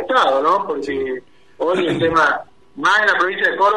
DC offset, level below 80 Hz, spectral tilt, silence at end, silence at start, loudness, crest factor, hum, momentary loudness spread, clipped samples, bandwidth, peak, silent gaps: 0.4%; -54 dBFS; -4.5 dB/octave; 0 s; 0 s; -17 LUFS; 14 dB; none; 10 LU; under 0.1%; 11.5 kHz; -4 dBFS; none